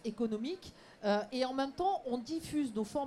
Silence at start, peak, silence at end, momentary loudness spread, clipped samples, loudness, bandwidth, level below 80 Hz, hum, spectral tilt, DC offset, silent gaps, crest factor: 0.05 s; -22 dBFS; 0 s; 7 LU; under 0.1%; -36 LUFS; 14 kHz; -66 dBFS; none; -5 dB/octave; under 0.1%; none; 14 dB